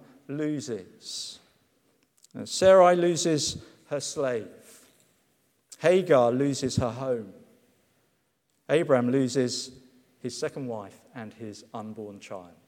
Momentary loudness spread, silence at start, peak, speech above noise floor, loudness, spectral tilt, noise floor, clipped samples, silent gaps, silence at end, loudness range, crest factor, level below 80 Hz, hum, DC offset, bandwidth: 21 LU; 0.3 s; -6 dBFS; 47 dB; -25 LUFS; -4.5 dB/octave; -73 dBFS; under 0.1%; none; 0.2 s; 5 LU; 22 dB; -62 dBFS; none; under 0.1%; 15.5 kHz